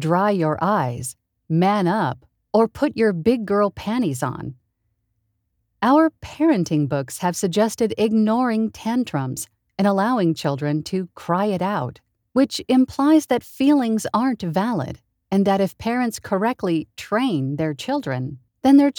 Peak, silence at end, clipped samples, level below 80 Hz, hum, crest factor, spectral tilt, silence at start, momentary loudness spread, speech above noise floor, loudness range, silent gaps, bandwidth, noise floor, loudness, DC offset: -4 dBFS; 0.1 s; under 0.1%; -56 dBFS; none; 16 dB; -6 dB/octave; 0 s; 9 LU; 52 dB; 3 LU; none; 20 kHz; -72 dBFS; -21 LUFS; under 0.1%